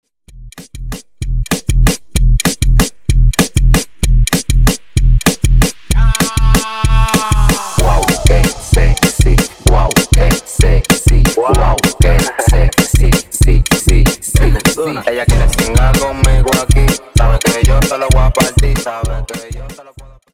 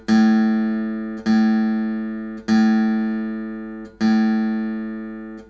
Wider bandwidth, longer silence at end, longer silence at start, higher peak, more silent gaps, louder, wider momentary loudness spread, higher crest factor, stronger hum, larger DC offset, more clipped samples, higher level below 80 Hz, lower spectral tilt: first, 16.5 kHz vs 7 kHz; about the same, 0 s vs 0.05 s; about the same, 0.05 s vs 0.1 s; first, 0 dBFS vs -8 dBFS; neither; first, -13 LUFS vs -20 LUFS; second, 6 LU vs 13 LU; about the same, 10 dB vs 12 dB; neither; first, 2% vs under 0.1%; neither; first, -12 dBFS vs -52 dBFS; second, -4.5 dB/octave vs -7 dB/octave